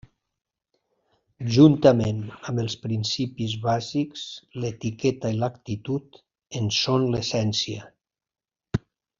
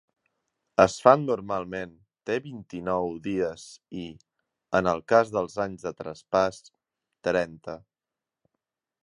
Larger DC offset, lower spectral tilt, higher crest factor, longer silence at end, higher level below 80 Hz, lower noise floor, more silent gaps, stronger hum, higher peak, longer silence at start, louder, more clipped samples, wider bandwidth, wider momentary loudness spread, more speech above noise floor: neither; about the same, -6 dB/octave vs -5.5 dB/octave; about the same, 22 dB vs 26 dB; second, 0.4 s vs 1.25 s; about the same, -56 dBFS vs -58 dBFS; about the same, under -90 dBFS vs -89 dBFS; neither; neither; about the same, -2 dBFS vs -2 dBFS; first, 1.4 s vs 0.8 s; about the same, -24 LUFS vs -26 LUFS; neither; second, 7.6 kHz vs 11.5 kHz; second, 14 LU vs 20 LU; first, over 67 dB vs 63 dB